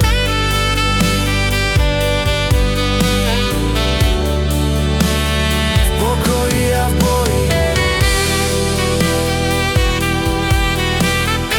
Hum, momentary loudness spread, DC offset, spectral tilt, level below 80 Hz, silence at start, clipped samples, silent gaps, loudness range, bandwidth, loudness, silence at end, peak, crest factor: none; 2 LU; under 0.1%; -4.5 dB/octave; -20 dBFS; 0 s; under 0.1%; none; 1 LU; 18 kHz; -15 LUFS; 0 s; -2 dBFS; 12 dB